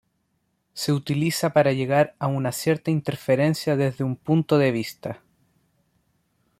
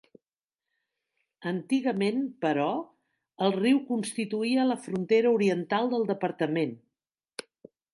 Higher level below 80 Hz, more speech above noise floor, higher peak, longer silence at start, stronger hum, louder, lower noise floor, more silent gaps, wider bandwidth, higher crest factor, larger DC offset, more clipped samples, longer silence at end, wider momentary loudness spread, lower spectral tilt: first, -62 dBFS vs -78 dBFS; second, 50 dB vs over 63 dB; first, -6 dBFS vs -12 dBFS; second, 0.75 s vs 1.4 s; neither; first, -23 LUFS vs -28 LUFS; second, -72 dBFS vs under -90 dBFS; neither; first, 15.5 kHz vs 11.5 kHz; about the same, 18 dB vs 18 dB; neither; neither; first, 1.45 s vs 0.55 s; about the same, 10 LU vs 12 LU; about the same, -6 dB/octave vs -6 dB/octave